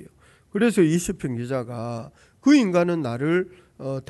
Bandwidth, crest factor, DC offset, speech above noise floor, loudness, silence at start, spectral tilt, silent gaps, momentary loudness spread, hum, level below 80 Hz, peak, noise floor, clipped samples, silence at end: 12 kHz; 18 dB; under 0.1%; 31 dB; -23 LUFS; 0 s; -6 dB/octave; none; 15 LU; none; -56 dBFS; -6 dBFS; -53 dBFS; under 0.1%; 0.1 s